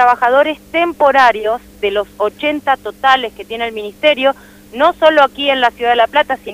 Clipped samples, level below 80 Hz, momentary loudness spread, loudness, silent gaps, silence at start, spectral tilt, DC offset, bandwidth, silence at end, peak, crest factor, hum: under 0.1%; -48 dBFS; 11 LU; -14 LUFS; none; 0 s; -3.5 dB/octave; under 0.1%; 16 kHz; 0 s; 0 dBFS; 14 dB; none